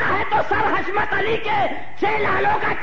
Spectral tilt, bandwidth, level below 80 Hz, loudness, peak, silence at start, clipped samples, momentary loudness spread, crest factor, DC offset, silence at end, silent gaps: -6 dB/octave; 7.6 kHz; -44 dBFS; -20 LUFS; -8 dBFS; 0 s; under 0.1%; 3 LU; 12 dB; 6%; 0 s; none